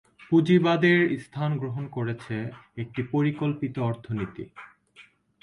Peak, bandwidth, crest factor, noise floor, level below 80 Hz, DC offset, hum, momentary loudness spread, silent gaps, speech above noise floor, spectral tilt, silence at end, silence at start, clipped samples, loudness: -8 dBFS; 10.5 kHz; 18 dB; -56 dBFS; -62 dBFS; under 0.1%; none; 15 LU; none; 30 dB; -8 dB/octave; 0.4 s; 0.2 s; under 0.1%; -26 LUFS